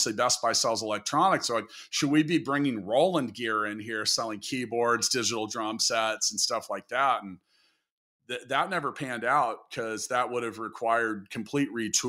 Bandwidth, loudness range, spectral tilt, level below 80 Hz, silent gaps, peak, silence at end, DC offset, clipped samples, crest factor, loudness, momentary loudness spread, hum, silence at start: 16 kHz; 4 LU; -2.5 dB/octave; -74 dBFS; 7.91-8.20 s; -12 dBFS; 0 s; under 0.1%; under 0.1%; 18 dB; -27 LUFS; 8 LU; none; 0 s